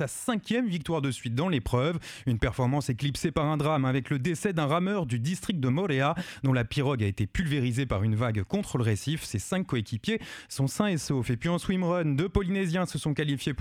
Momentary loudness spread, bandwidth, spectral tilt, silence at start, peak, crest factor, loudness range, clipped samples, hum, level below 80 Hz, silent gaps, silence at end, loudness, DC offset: 4 LU; 15.5 kHz; -6 dB/octave; 0 s; -10 dBFS; 18 dB; 2 LU; under 0.1%; none; -46 dBFS; none; 0 s; -29 LUFS; under 0.1%